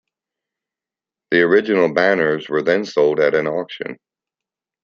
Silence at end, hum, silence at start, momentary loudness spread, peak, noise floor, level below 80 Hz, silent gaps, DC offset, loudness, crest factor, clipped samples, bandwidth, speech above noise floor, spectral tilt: 0.9 s; none; 1.3 s; 11 LU; -2 dBFS; -89 dBFS; -64 dBFS; none; under 0.1%; -17 LUFS; 18 dB; under 0.1%; 7.2 kHz; 72 dB; -6 dB/octave